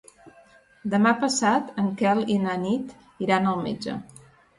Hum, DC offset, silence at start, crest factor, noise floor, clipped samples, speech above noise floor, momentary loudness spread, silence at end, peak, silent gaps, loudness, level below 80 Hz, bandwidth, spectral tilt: none; under 0.1%; 0.25 s; 18 dB; -55 dBFS; under 0.1%; 31 dB; 12 LU; 0.55 s; -6 dBFS; none; -24 LUFS; -64 dBFS; 11.5 kHz; -5 dB/octave